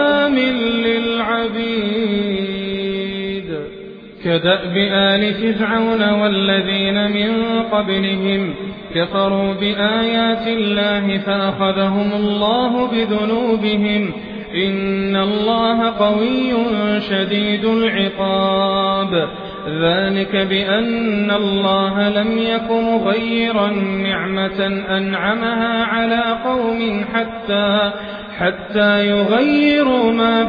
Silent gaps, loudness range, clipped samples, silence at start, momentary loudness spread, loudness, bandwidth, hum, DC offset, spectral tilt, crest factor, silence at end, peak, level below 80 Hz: none; 2 LU; under 0.1%; 0 s; 6 LU; -17 LUFS; 5.2 kHz; none; under 0.1%; -8 dB/octave; 14 dB; 0 s; -2 dBFS; -46 dBFS